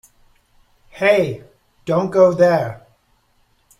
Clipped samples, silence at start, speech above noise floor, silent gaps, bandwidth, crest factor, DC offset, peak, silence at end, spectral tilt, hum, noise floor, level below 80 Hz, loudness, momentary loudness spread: under 0.1%; 0.95 s; 45 dB; none; 13.5 kHz; 18 dB; under 0.1%; 0 dBFS; 1 s; -6.5 dB/octave; none; -60 dBFS; -56 dBFS; -17 LUFS; 17 LU